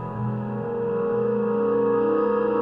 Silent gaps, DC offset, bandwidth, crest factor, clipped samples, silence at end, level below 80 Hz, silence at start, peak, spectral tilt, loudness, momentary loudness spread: none; under 0.1%; 3.8 kHz; 12 dB; under 0.1%; 0 s; -56 dBFS; 0 s; -12 dBFS; -11 dB/octave; -24 LUFS; 7 LU